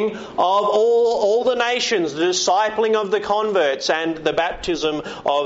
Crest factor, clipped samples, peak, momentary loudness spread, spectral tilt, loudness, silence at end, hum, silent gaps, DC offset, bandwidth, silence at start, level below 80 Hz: 14 dB; under 0.1%; -6 dBFS; 6 LU; -1.5 dB/octave; -19 LUFS; 0 s; none; none; under 0.1%; 8 kHz; 0 s; -50 dBFS